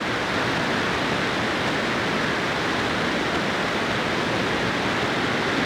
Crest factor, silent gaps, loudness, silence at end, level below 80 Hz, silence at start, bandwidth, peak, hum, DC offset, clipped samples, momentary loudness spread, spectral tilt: 10 dB; none; -23 LUFS; 0 s; -48 dBFS; 0 s; 20 kHz; -12 dBFS; none; under 0.1%; under 0.1%; 1 LU; -4 dB/octave